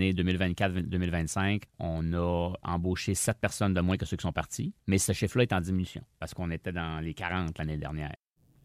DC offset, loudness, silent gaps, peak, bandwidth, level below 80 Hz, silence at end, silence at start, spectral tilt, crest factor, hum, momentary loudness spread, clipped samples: under 0.1%; -31 LUFS; none; -12 dBFS; 15.5 kHz; -46 dBFS; 0.5 s; 0 s; -5 dB/octave; 20 dB; none; 8 LU; under 0.1%